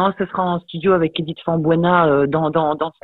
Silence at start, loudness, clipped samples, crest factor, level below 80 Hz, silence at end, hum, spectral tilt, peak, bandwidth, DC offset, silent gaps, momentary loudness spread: 0 s; -18 LUFS; under 0.1%; 16 dB; -50 dBFS; 0.15 s; none; -10 dB/octave; -2 dBFS; 4.2 kHz; under 0.1%; none; 7 LU